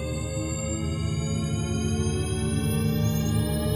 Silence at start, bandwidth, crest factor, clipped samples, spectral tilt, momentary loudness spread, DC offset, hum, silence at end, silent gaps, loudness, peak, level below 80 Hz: 0 s; 17.5 kHz; 12 dB; under 0.1%; -5.5 dB/octave; 4 LU; under 0.1%; none; 0 s; none; -27 LUFS; -14 dBFS; -38 dBFS